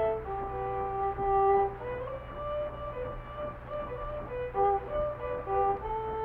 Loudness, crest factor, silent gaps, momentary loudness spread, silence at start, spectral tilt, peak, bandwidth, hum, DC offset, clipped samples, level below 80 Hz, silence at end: -32 LUFS; 16 dB; none; 12 LU; 0 s; -9 dB/octave; -16 dBFS; 4.2 kHz; none; under 0.1%; under 0.1%; -46 dBFS; 0 s